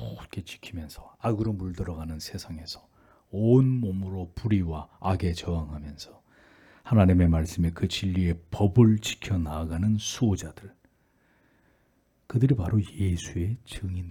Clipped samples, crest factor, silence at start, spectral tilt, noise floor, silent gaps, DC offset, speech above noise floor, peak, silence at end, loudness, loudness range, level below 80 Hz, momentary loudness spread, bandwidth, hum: under 0.1%; 20 dB; 0 s; -7 dB/octave; -67 dBFS; none; under 0.1%; 41 dB; -6 dBFS; 0 s; -27 LUFS; 7 LU; -46 dBFS; 18 LU; 15 kHz; none